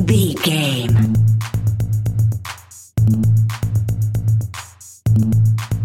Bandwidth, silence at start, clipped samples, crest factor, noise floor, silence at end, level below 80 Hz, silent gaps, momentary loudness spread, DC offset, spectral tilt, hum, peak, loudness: 15.5 kHz; 0 s; under 0.1%; 14 dB; -36 dBFS; 0 s; -36 dBFS; none; 12 LU; 0.5%; -6 dB/octave; none; -2 dBFS; -17 LUFS